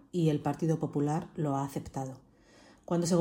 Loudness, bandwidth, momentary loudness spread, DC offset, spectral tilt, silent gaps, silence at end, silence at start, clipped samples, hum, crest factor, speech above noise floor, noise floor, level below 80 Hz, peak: -32 LUFS; 16.5 kHz; 12 LU; under 0.1%; -7 dB/octave; none; 0 s; 0.15 s; under 0.1%; none; 16 dB; 28 dB; -59 dBFS; -62 dBFS; -14 dBFS